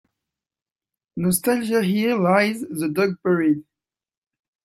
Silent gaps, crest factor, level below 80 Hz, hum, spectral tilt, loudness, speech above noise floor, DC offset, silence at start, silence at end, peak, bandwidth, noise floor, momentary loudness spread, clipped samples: none; 18 dB; -62 dBFS; none; -5.5 dB/octave; -21 LUFS; over 70 dB; under 0.1%; 1.15 s; 1.05 s; -4 dBFS; 16 kHz; under -90 dBFS; 8 LU; under 0.1%